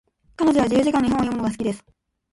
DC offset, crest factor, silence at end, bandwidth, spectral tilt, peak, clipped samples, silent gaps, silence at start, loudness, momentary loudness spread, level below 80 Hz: under 0.1%; 14 dB; 0.55 s; 11.5 kHz; -6 dB/octave; -8 dBFS; under 0.1%; none; 0.4 s; -21 LUFS; 9 LU; -48 dBFS